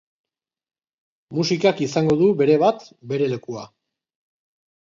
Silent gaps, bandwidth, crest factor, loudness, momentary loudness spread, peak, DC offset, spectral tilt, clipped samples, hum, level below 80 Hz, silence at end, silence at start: none; 7.6 kHz; 18 dB; -20 LUFS; 15 LU; -4 dBFS; under 0.1%; -6 dB/octave; under 0.1%; none; -62 dBFS; 1.2 s; 1.3 s